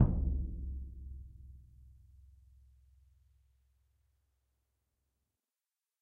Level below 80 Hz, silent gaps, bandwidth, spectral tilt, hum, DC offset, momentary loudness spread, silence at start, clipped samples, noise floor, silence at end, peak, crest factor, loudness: -44 dBFS; none; 1.8 kHz; -12.5 dB/octave; none; under 0.1%; 26 LU; 0 s; under 0.1%; under -90 dBFS; 4.1 s; -12 dBFS; 28 dB; -39 LUFS